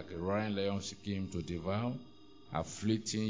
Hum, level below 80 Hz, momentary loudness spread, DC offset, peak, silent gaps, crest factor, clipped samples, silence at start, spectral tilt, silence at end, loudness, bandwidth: none; -56 dBFS; 7 LU; 0.1%; -18 dBFS; none; 18 dB; under 0.1%; 0 s; -5.5 dB/octave; 0 s; -37 LUFS; 7.6 kHz